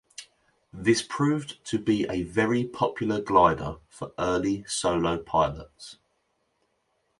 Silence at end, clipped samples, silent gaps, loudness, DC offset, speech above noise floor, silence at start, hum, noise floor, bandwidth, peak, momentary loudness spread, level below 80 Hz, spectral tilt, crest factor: 1.25 s; under 0.1%; none; -26 LUFS; under 0.1%; 47 dB; 0.2 s; none; -73 dBFS; 11.5 kHz; -6 dBFS; 18 LU; -52 dBFS; -5 dB/octave; 22 dB